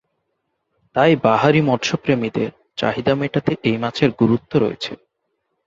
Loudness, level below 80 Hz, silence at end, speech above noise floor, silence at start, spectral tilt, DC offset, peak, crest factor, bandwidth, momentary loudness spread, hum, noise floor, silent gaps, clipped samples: -19 LUFS; -54 dBFS; 0.7 s; 55 dB; 0.95 s; -6.5 dB/octave; under 0.1%; -2 dBFS; 18 dB; 7.8 kHz; 10 LU; none; -73 dBFS; none; under 0.1%